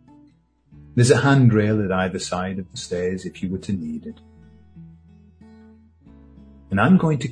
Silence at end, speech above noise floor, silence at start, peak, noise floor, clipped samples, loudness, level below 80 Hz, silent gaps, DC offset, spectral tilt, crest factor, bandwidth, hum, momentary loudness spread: 0 s; 37 dB; 0.8 s; -2 dBFS; -56 dBFS; under 0.1%; -20 LUFS; -50 dBFS; none; under 0.1%; -6.5 dB/octave; 20 dB; 10 kHz; none; 14 LU